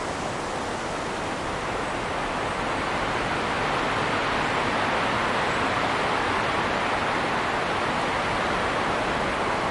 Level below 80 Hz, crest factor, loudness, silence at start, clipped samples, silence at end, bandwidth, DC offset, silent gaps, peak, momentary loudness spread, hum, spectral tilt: -46 dBFS; 14 dB; -25 LUFS; 0 s; under 0.1%; 0 s; 11.5 kHz; under 0.1%; none; -12 dBFS; 5 LU; none; -4 dB/octave